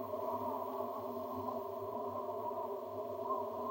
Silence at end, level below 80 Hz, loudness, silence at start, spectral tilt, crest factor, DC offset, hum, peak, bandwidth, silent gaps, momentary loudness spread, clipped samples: 0 s; -80 dBFS; -41 LUFS; 0 s; -7 dB/octave; 14 dB; under 0.1%; none; -26 dBFS; 16 kHz; none; 3 LU; under 0.1%